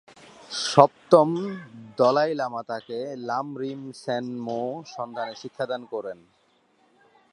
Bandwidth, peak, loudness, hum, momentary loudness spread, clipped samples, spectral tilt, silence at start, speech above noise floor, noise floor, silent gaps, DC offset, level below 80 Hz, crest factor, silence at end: 11 kHz; 0 dBFS; -25 LUFS; none; 16 LU; under 0.1%; -5 dB/octave; 0.4 s; 40 dB; -64 dBFS; none; under 0.1%; -74 dBFS; 26 dB; 1.2 s